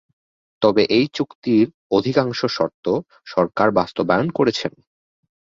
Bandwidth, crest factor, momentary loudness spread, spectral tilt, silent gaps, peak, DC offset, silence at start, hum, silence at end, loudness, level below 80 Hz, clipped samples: 7.6 kHz; 18 dB; 7 LU; -6.5 dB/octave; 1.35-1.42 s, 1.74-1.90 s, 2.74-2.83 s; -2 dBFS; under 0.1%; 0.6 s; none; 0.9 s; -20 LUFS; -56 dBFS; under 0.1%